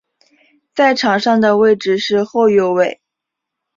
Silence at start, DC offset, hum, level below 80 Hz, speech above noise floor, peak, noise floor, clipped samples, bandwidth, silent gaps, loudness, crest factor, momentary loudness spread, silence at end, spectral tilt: 0.75 s; under 0.1%; none; -60 dBFS; 67 dB; -2 dBFS; -80 dBFS; under 0.1%; 7.6 kHz; none; -14 LUFS; 14 dB; 5 LU; 0.85 s; -5 dB/octave